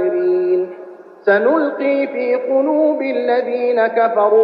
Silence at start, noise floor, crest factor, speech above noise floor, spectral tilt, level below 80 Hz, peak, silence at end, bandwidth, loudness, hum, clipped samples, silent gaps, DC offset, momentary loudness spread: 0 s; -36 dBFS; 14 dB; 22 dB; -8 dB/octave; -72 dBFS; -2 dBFS; 0 s; 5.2 kHz; -16 LUFS; none; under 0.1%; none; under 0.1%; 5 LU